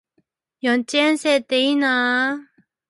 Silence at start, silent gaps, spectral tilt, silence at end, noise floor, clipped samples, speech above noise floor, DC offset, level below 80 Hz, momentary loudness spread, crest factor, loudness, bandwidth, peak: 0.65 s; none; -2 dB/octave; 0.45 s; -68 dBFS; under 0.1%; 49 dB; under 0.1%; -76 dBFS; 6 LU; 14 dB; -19 LUFS; 11.5 kHz; -6 dBFS